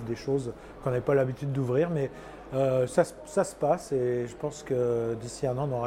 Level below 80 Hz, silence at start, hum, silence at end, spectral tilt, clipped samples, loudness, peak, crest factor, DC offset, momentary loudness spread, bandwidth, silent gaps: -54 dBFS; 0 s; none; 0 s; -7 dB/octave; under 0.1%; -29 LUFS; -10 dBFS; 18 dB; under 0.1%; 9 LU; 15.5 kHz; none